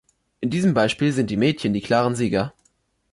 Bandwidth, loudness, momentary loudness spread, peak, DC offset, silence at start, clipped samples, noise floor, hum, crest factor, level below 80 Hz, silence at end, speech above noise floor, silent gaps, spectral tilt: 11.5 kHz; -21 LUFS; 6 LU; -8 dBFS; under 0.1%; 0.4 s; under 0.1%; -66 dBFS; none; 14 dB; -52 dBFS; 0.65 s; 45 dB; none; -6 dB/octave